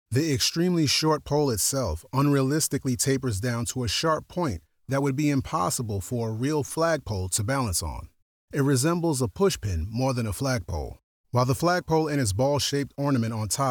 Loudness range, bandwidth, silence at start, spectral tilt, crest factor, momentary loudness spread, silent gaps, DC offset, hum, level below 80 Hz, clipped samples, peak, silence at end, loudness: 3 LU; over 20 kHz; 0.1 s; -4.5 dB/octave; 14 dB; 7 LU; 8.22-8.48 s, 11.03-11.24 s; under 0.1%; none; -48 dBFS; under 0.1%; -12 dBFS; 0 s; -25 LUFS